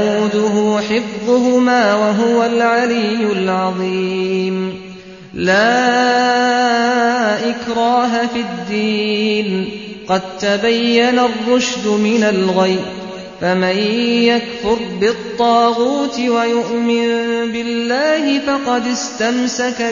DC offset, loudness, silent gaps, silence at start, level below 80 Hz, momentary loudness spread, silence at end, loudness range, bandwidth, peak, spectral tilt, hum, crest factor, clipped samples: under 0.1%; -15 LUFS; none; 0 s; -52 dBFS; 7 LU; 0 s; 2 LU; 7.4 kHz; -2 dBFS; -4.5 dB/octave; none; 14 dB; under 0.1%